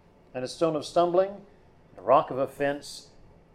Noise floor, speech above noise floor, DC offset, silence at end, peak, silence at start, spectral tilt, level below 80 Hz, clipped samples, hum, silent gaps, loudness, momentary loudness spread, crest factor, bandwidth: -51 dBFS; 25 dB; under 0.1%; 0.55 s; -8 dBFS; 0.35 s; -5.5 dB/octave; -62 dBFS; under 0.1%; none; none; -27 LUFS; 18 LU; 20 dB; 14.5 kHz